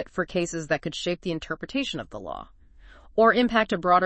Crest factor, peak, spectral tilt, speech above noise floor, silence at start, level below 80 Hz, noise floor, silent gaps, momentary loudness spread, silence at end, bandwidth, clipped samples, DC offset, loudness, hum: 20 dB; -6 dBFS; -4.5 dB/octave; 25 dB; 0 s; -50 dBFS; -50 dBFS; none; 16 LU; 0 s; 8.8 kHz; under 0.1%; under 0.1%; -25 LUFS; none